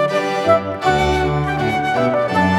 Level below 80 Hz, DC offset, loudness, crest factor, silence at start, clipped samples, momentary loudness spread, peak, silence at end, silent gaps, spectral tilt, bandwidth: -36 dBFS; under 0.1%; -17 LUFS; 14 dB; 0 s; under 0.1%; 3 LU; -2 dBFS; 0 s; none; -6 dB/octave; 15.5 kHz